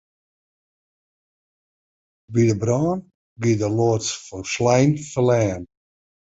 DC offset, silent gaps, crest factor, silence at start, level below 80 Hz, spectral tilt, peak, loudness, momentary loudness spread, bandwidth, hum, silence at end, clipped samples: under 0.1%; 3.14-3.36 s; 20 dB; 2.3 s; -52 dBFS; -6 dB/octave; -2 dBFS; -21 LUFS; 10 LU; 8 kHz; none; 0.65 s; under 0.1%